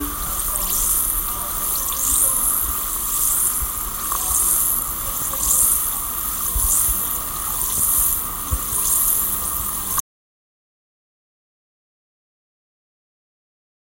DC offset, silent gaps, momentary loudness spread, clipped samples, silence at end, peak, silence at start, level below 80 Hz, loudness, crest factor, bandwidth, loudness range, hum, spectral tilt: under 0.1%; none; 7 LU; under 0.1%; 4 s; -2 dBFS; 0 s; -36 dBFS; -18 LUFS; 20 dB; 16.5 kHz; 5 LU; none; -1 dB/octave